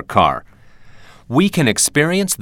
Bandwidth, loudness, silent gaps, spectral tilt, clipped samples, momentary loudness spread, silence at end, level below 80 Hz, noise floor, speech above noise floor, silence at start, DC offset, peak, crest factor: 19 kHz; -15 LUFS; none; -4 dB/octave; under 0.1%; 5 LU; 0 s; -48 dBFS; -41 dBFS; 25 dB; 0 s; under 0.1%; 0 dBFS; 18 dB